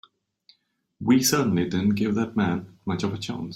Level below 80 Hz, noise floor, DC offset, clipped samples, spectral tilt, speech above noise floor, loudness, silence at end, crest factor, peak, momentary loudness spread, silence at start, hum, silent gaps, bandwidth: -60 dBFS; -66 dBFS; under 0.1%; under 0.1%; -5 dB/octave; 43 dB; -24 LUFS; 0 s; 18 dB; -8 dBFS; 11 LU; 1 s; none; none; 16.5 kHz